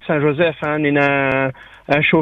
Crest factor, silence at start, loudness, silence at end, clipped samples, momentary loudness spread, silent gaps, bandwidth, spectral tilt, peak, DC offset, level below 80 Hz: 16 dB; 0.05 s; -17 LUFS; 0 s; under 0.1%; 6 LU; none; 6.8 kHz; -8 dB/octave; 0 dBFS; under 0.1%; -50 dBFS